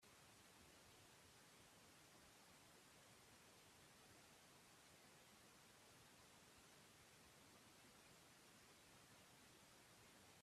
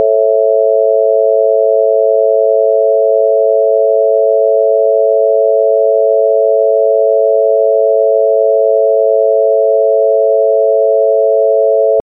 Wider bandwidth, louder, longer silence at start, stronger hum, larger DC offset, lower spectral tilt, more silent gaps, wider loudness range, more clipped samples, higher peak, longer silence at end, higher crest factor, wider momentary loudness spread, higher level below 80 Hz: first, 14.5 kHz vs 0.8 kHz; second, -67 LUFS vs -10 LUFS; about the same, 0 s vs 0 s; neither; neither; second, -2.5 dB/octave vs -11 dB/octave; neither; about the same, 0 LU vs 0 LU; neither; second, -54 dBFS vs -2 dBFS; about the same, 0 s vs 0 s; first, 14 dB vs 8 dB; about the same, 0 LU vs 0 LU; about the same, -88 dBFS vs under -90 dBFS